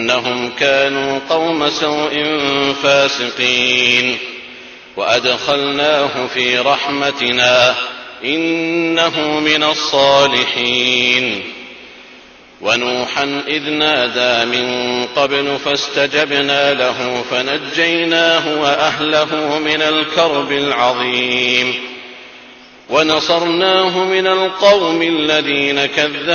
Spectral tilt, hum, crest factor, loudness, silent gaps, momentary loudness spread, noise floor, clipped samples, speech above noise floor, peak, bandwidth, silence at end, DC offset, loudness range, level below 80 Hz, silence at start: -3 dB/octave; none; 14 dB; -14 LUFS; none; 7 LU; -41 dBFS; under 0.1%; 26 dB; 0 dBFS; 7 kHz; 0 s; under 0.1%; 3 LU; -56 dBFS; 0 s